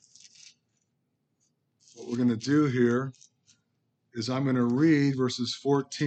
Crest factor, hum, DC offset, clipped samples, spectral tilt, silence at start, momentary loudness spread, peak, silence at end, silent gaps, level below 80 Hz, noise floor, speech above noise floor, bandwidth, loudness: 16 dB; none; under 0.1%; under 0.1%; -6 dB/octave; 1.95 s; 13 LU; -12 dBFS; 0 s; none; -76 dBFS; -77 dBFS; 51 dB; 8.8 kHz; -26 LUFS